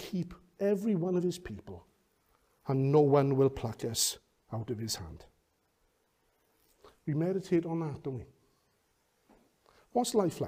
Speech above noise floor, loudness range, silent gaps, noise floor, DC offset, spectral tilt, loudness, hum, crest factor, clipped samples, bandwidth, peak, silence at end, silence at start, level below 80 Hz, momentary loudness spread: 43 dB; 7 LU; none; -74 dBFS; under 0.1%; -5.5 dB/octave; -31 LUFS; none; 20 dB; under 0.1%; 15.5 kHz; -14 dBFS; 0 s; 0 s; -62 dBFS; 19 LU